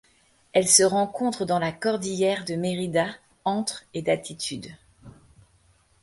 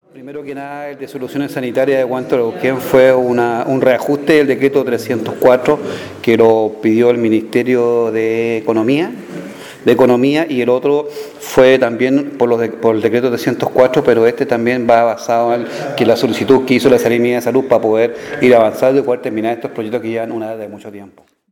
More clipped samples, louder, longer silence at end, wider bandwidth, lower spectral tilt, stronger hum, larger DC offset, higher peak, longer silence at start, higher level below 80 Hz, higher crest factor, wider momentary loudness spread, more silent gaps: neither; second, -24 LUFS vs -13 LUFS; first, 0.9 s vs 0.45 s; second, 12 kHz vs 19 kHz; second, -3 dB/octave vs -6 dB/octave; neither; neither; second, -4 dBFS vs 0 dBFS; first, 0.55 s vs 0.15 s; second, -62 dBFS vs -54 dBFS; first, 24 dB vs 14 dB; about the same, 14 LU vs 14 LU; neither